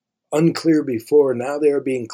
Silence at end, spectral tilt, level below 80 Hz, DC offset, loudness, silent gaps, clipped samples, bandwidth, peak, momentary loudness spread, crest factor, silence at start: 0 s; -6.5 dB/octave; -68 dBFS; under 0.1%; -18 LUFS; none; under 0.1%; 15.5 kHz; -4 dBFS; 4 LU; 14 dB; 0.3 s